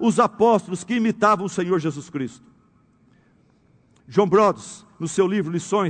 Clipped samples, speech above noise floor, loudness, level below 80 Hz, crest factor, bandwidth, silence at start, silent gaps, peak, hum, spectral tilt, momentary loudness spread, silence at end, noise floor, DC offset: under 0.1%; 38 dB; -21 LUFS; -64 dBFS; 18 dB; 9.4 kHz; 0 s; none; -4 dBFS; none; -6 dB/octave; 13 LU; 0 s; -58 dBFS; under 0.1%